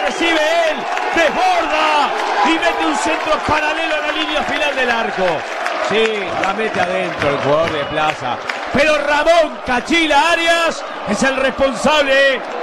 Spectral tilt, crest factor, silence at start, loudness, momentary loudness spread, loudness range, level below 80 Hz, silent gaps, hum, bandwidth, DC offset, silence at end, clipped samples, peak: -3 dB/octave; 14 dB; 0 s; -15 LUFS; 6 LU; 3 LU; -42 dBFS; none; none; 13.5 kHz; under 0.1%; 0 s; under 0.1%; -2 dBFS